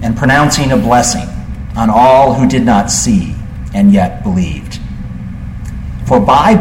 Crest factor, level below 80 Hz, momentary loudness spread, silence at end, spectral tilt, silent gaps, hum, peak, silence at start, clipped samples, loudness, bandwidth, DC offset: 10 dB; -26 dBFS; 17 LU; 0 s; -5 dB/octave; none; none; 0 dBFS; 0 s; under 0.1%; -10 LUFS; 16.5 kHz; under 0.1%